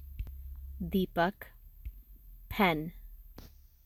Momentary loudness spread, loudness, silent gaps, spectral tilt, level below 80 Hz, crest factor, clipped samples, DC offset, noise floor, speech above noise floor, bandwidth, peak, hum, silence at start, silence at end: 25 LU; -33 LUFS; none; -7 dB/octave; -48 dBFS; 24 dB; under 0.1%; under 0.1%; -53 dBFS; 23 dB; 17.5 kHz; -12 dBFS; none; 0 s; 0.35 s